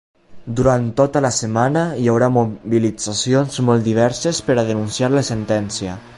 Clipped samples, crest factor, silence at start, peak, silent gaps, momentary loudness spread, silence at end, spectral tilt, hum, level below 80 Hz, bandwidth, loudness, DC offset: under 0.1%; 16 dB; 0.3 s; -2 dBFS; none; 5 LU; 0 s; -5.5 dB/octave; none; -44 dBFS; 11.5 kHz; -18 LUFS; under 0.1%